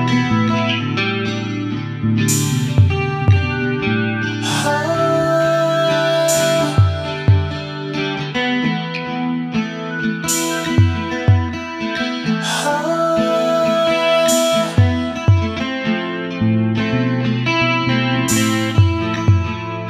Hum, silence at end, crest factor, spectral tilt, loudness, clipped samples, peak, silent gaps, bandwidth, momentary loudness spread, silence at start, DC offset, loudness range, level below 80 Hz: none; 0 s; 16 dB; -5 dB/octave; -17 LUFS; under 0.1%; -2 dBFS; none; 15 kHz; 7 LU; 0 s; under 0.1%; 3 LU; -44 dBFS